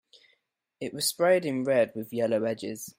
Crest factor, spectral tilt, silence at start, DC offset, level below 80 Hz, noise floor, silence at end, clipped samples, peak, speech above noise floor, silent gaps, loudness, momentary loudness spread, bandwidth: 18 dB; -4 dB/octave; 0.8 s; under 0.1%; -74 dBFS; -73 dBFS; 0.1 s; under 0.1%; -10 dBFS; 45 dB; none; -27 LUFS; 11 LU; 16 kHz